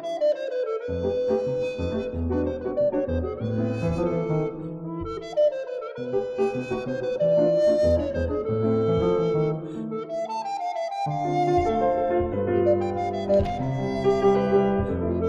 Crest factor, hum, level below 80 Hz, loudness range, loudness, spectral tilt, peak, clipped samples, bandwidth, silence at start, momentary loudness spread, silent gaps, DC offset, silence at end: 16 dB; none; -42 dBFS; 4 LU; -25 LUFS; -8 dB/octave; -8 dBFS; under 0.1%; 9.2 kHz; 0 s; 9 LU; none; under 0.1%; 0 s